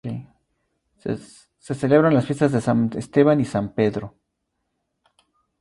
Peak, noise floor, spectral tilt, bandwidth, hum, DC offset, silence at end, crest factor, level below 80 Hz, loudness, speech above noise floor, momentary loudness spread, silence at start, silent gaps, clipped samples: -2 dBFS; -76 dBFS; -7.5 dB/octave; 11.5 kHz; none; under 0.1%; 1.5 s; 20 dB; -56 dBFS; -20 LUFS; 56 dB; 16 LU; 0.05 s; none; under 0.1%